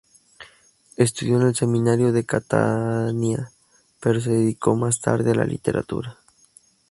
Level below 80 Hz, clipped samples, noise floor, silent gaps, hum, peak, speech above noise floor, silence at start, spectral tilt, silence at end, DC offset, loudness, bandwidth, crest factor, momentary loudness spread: -54 dBFS; under 0.1%; -56 dBFS; none; none; -2 dBFS; 35 dB; 0.4 s; -6 dB/octave; 0.8 s; under 0.1%; -22 LUFS; 11.5 kHz; 20 dB; 9 LU